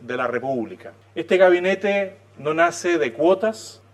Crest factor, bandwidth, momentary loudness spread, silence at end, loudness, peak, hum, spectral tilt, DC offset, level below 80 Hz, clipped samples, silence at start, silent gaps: 18 dB; 12.5 kHz; 17 LU; 0.2 s; -20 LUFS; -2 dBFS; none; -5 dB/octave; under 0.1%; -76 dBFS; under 0.1%; 0 s; none